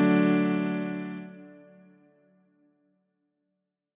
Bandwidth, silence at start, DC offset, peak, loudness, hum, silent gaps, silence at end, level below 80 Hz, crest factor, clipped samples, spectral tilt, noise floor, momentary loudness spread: 3.9 kHz; 0 s; under 0.1%; -10 dBFS; -27 LUFS; none; none; 2.4 s; -84 dBFS; 20 dB; under 0.1%; -7 dB/octave; -82 dBFS; 22 LU